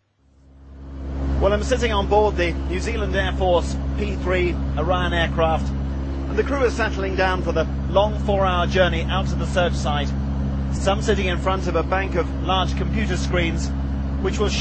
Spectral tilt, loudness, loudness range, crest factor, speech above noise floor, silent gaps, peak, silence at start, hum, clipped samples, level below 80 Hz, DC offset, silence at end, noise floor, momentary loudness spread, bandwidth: -6 dB/octave; -22 LUFS; 2 LU; 16 dB; 34 dB; none; -4 dBFS; 0.6 s; none; under 0.1%; -26 dBFS; under 0.1%; 0 s; -54 dBFS; 6 LU; 8.6 kHz